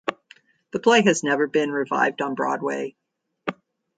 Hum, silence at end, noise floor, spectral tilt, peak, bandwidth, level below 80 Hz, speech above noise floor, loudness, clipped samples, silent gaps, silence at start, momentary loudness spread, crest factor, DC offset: none; 0.45 s; -55 dBFS; -4 dB/octave; -4 dBFS; 9.2 kHz; -72 dBFS; 33 dB; -22 LUFS; under 0.1%; none; 0.05 s; 16 LU; 20 dB; under 0.1%